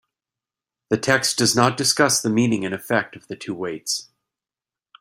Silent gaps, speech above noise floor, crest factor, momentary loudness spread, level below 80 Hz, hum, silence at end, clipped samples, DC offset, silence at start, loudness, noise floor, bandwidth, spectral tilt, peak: none; over 69 dB; 22 dB; 12 LU; -62 dBFS; none; 0.95 s; under 0.1%; under 0.1%; 0.9 s; -20 LUFS; under -90 dBFS; 16 kHz; -3 dB/octave; -2 dBFS